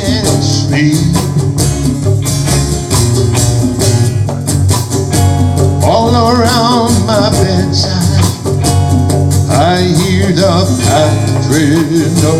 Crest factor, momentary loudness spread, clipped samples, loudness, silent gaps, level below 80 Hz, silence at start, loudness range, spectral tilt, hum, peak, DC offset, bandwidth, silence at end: 10 dB; 3 LU; under 0.1%; -10 LUFS; none; -28 dBFS; 0 s; 2 LU; -5.5 dB/octave; none; 0 dBFS; under 0.1%; 15.5 kHz; 0 s